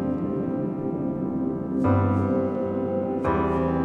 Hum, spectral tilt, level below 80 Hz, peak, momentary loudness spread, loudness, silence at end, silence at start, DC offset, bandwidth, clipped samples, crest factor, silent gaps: none; -10.5 dB/octave; -46 dBFS; -10 dBFS; 6 LU; -25 LUFS; 0 s; 0 s; under 0.1%; 4.3 kHz; under 0.1%; 14 dB; none